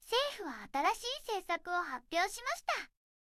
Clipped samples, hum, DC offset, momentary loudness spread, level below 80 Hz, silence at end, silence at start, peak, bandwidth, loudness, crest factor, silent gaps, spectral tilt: under 0.1%; none; under 0.1%; 6 LU; -68 dBFS; 0.5 s; 0 s; -18 dBFS; 16 kHz; -36 LUFS; 18 dB; none; -0.5 dB/octave